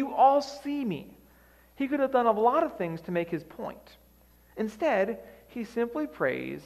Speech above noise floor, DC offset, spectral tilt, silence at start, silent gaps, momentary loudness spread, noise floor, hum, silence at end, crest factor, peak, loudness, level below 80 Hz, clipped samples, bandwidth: 31 dB; under 0.1%; -6.5 dB/octave; 0 s; none; 17 LU; -59 dBFS; none; 0 s; 18 dB; -10 dBFS; -28 LUFS; -62 dBFS; under 0.1%; 15 kHz